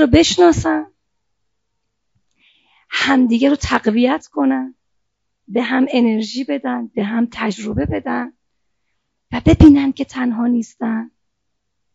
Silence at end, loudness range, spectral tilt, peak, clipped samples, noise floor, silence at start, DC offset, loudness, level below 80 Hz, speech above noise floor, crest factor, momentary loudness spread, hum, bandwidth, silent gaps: 0.85 s; 4 LU; -5.5 dB/octave; 0 dBFS; under 0.1%; -75 dBFS; 0 s; under 0.1%; -16 LUFS; -36 dBFS; 60 dB; 18 dB; 13 LU; none; 7.8 kHz; none